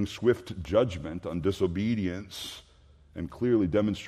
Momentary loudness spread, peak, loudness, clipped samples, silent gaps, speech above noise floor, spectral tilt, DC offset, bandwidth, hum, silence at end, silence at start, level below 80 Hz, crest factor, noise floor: 14 LU; -10 dBFS; -29 LUFS; under 0.1%; none; 28 dB; -6.5 dB/octave; under 0.1%; 14.5 kHz; none; 0 s; 0 s; -54 dBFS; 18 dB; -56 dBFS